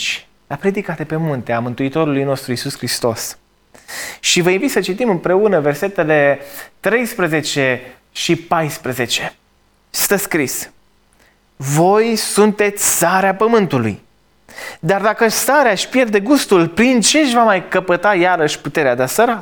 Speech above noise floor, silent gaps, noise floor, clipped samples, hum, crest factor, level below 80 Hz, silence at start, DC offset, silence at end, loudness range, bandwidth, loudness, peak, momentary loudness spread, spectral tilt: 41 dB; none; -56 dBFS; under 0.1%; none; 14 dB; -54 dBFS; 0 s; under 0.1%; 0 s; 6 LU; over 20 kHz; -15 LUFS; -2 dBFS; 12 LU; -4 dB/octave